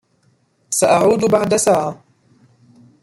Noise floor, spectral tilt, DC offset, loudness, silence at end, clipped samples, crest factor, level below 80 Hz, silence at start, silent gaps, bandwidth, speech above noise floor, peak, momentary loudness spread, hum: -60 dBFS; -4 dB/octave; under 0.1%; -15 LUFS; 1.1 s; under 0.1%; 16 dB; -56 dBFS; 0.7 s; none; 16 kHz; 45 dB; -2 dBFS; 7 LU; none